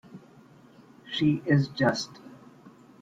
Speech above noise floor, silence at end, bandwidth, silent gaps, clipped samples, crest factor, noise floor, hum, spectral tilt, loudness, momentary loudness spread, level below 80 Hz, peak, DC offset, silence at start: 29 dB; 0.35 s; 7.8 kHz; none; under 0.1%; 20 dB; -54 dBFS; none; -6 dB/octave; -27 LUFS; 15 LU; -64 dBFS; -10 dBFS; under 0.1%; 0.15 s